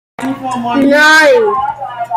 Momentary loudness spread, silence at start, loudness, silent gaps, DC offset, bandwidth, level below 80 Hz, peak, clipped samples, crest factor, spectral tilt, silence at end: 15 LU; 0.2 s; -9 LUFS; none; under 0.1%; 16 kHz; -52 dBFS; 0 dBFS; under 0.1%; 10 dB; -3 dB/octave; 0 s